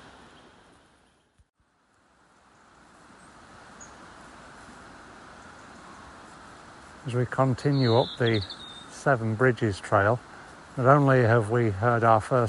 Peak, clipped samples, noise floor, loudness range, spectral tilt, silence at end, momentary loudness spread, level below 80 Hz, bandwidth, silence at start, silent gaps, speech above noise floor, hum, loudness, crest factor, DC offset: -4 dBFS; under 0.1%; -67 dBFS; 24 LU; -7 dB/octave; 0 s; 26 LU; -60 dBFS; 11.5 kHz; 3.8 s; none; 44 dB; none; -24 LUFS; 22 dB; under 0.1%